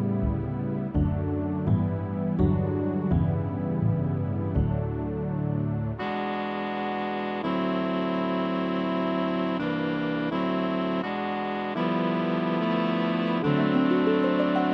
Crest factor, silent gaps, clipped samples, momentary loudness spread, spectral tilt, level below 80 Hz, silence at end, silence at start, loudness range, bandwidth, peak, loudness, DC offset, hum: 16 dB; none; under 0.1%; 6 LU; -9.5 dB/octave; -42 dBFS; 0 s; 0 s; 3 LU; 6 kHz; -10 dBFS; -27 LUFS; under 0.1%; none